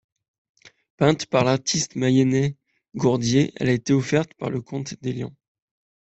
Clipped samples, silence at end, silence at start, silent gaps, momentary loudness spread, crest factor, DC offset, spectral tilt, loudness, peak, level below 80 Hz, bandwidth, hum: under 0.1%; 0.8 s; 1 s; none; 10 LU; 20 dB; under 0.1%; -5.5 dB/octave; -22 LUFS; -4 dBFS; -58 dBFS; 8.2 kHz; none